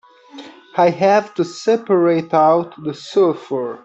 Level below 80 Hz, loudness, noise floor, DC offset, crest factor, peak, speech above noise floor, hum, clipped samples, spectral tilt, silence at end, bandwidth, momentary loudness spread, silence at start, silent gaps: -66 dBFS; -17 LUFS; -39 dBFS; under 0.1%; 14 dB; -4 dBFS; 23 dB; none; under 0.1%; -6.5 dB/octave; 0.05 s; 8.2 kHz; 10 LU; 0.35 s; none